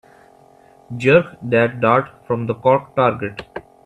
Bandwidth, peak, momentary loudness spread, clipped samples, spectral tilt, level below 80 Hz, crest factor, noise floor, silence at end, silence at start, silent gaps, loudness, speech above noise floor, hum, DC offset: 9 kHz; 0 dBFS; 15 LU; under 0.1%; -7.5 dB/octave; -56 dBFS; 18 dB; -49 dBFS; 0.25 s; 0.9 s; none; -18 LUFS; 32 dB; none; under 0.1%